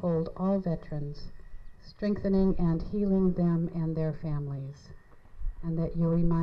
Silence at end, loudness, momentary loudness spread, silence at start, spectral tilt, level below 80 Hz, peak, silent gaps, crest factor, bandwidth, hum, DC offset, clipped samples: 0 s; -30 LUFS; 16 LU; 0 s; -10.5 dB/octave; -40 dBFS; -14 dBFS; none; 16 dB; 5.8 kHz; none; under 0.1%; under 0.1%